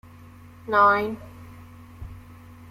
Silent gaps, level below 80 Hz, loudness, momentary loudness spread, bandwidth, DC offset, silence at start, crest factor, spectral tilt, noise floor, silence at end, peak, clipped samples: none; -52 dBFS; -21 LUFS; 27 LU; 16 kHz; under 0.1%; 0.65 s; 20 dB; -6.5 dB/octave; -46 dBFS; 0.35 s; -6 dBFS; under 0.1%